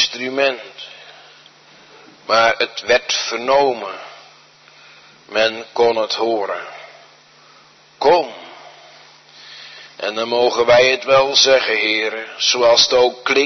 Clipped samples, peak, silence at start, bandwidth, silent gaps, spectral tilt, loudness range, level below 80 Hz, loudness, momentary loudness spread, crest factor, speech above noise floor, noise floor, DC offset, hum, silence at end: under 0.1%; -2 dBFS; 0 s; 6.4 kHz; none; -1.5 dB/octave; 9 LU; -58 dBFS; -15 LUFS; 23 LU; 18 dB; 32 dB; -48 dBFS; under 0.1%; none; 0 s